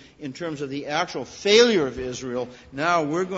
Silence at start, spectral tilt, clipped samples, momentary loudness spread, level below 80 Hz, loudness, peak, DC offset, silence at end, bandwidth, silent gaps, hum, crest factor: 0.2 s; -3.5 dB/octave; under 0.1%; 15 LU; -54 dBFS; -23 LUFS; -4 dBFS; under 0.1%; 0 s; 8 kHz; none; none; 20 dB